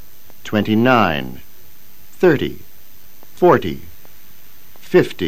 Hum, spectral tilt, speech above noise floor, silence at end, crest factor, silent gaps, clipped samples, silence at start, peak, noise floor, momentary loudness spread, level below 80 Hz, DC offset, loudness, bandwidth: none; -6.5 dB/octave; 31 dB; 0 s; 18 dB; none; under 0.1%; 0.45 s; 0 dBFS; -47 dBFS; 19 LU; -48 dBFS; 4%; -16 LUFS; 15.5 kHz